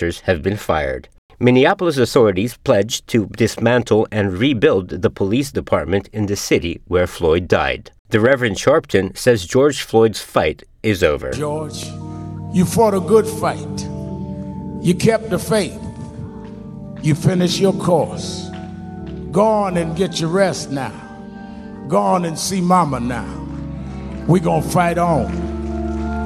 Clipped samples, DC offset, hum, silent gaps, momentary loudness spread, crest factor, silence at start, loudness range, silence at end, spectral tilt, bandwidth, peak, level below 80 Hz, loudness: under 0.1%; under 0.1%; none; 1.18-1.29 s, 7.99-8.05 s; 15 LU; 16 dB; 0 s; 4 LU; 0 s; -5.5 dB/octave; 16 kHz; 0 dBFS; -38 dBFS; -18 LUFS